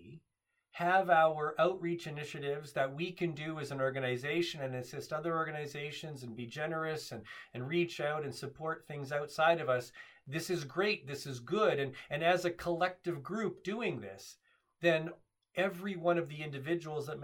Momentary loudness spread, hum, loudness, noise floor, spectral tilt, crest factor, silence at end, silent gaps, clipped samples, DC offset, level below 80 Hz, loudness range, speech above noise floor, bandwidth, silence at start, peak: 12 LU; none; -35 LUFS; -84 dBFS; -5.5 dB/octave; 20 dB; 0 s; none; under 0.1%; under 0.1%; -74 dBFS; 5 LU; 49 dB; 18 kHz; 0 s; -14 dBFS